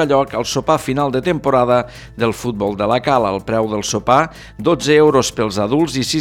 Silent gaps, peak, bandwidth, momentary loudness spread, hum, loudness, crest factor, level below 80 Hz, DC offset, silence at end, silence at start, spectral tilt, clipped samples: none; 0 dBFS; 17 kHz; 7 LU; none; -16 LUFS; 16 dB; -42 dBFS; under 0.1%; 0 s; 0 s; -5 dB/octave; under 0.1%